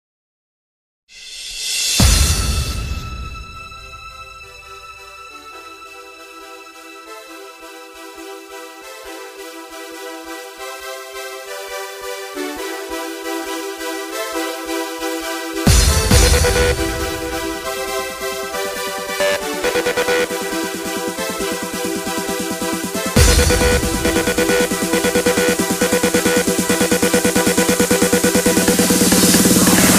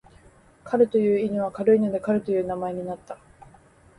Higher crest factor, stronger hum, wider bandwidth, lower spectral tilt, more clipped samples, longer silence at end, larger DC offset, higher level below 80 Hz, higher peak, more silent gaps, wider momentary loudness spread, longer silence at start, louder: about the same, 18 dB vs 18 dB; neither; first, 16 kHz vs 11 kHz; second, -3.5 dB/octave vs -8.5 dB/octave; neither; second, 0 s vs 0.85 s; neither; first, -26 dBFS vs -60 dBFS; first, 0 dBFS vs -8 dBFS; neither; first, 22 LU vs 15 LU; first, 1.1 s vs 0.65 s; first, -17 LUFS vs -24 LUFS